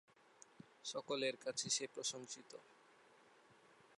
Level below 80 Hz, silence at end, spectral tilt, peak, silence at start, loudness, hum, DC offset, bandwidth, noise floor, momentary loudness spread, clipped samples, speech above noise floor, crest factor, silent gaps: under -90 dBFS; 0.05 s; -1.5 dB/octave; -24 dBFS; 0.6 s; -43 LUFS; none; under 0.1%; 11.5 kHz; -68 dBFS; 23 LU; under 0.1%; 24 dB; 24 dB; none